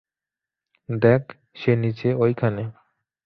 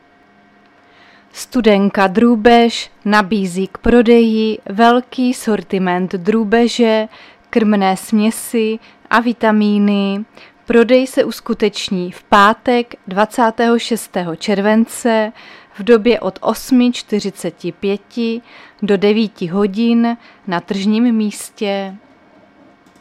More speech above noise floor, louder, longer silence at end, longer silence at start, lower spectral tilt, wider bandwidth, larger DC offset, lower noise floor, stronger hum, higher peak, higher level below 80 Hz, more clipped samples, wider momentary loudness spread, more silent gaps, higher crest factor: first, 68 dB vs 35 dB; second, -22 LUFS vs -15 LUFS; second, 0.55 s vs 1.05 s; second, 0.9 s vs 1.35 s; first, -10 dB/octave vs -5.5 dB/octave; second, 5.8 kHz vs 14.5 kHz; neither; first, -89 dBFS vs -49 dBFS; neither; second, -4 dBFS vs 0 dBFS; second, -58 dBFS vs -44 dBFS; neither; about the same, 13 LU vs 11 LU; neither; first, 20 dB vs 14 dB